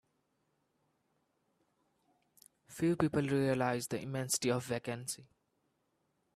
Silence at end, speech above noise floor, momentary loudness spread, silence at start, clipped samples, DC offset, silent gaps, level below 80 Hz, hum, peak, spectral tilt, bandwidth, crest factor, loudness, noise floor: 1.1 s; 45 dB; 10 LU; 2.7 s; under 0.1%; under 0.1%; none; -70 dBFS; none; -16 dBFS; -5 dB/octave; 15.5 kHz; 22 dB; -35 LUFS; -80 dBFS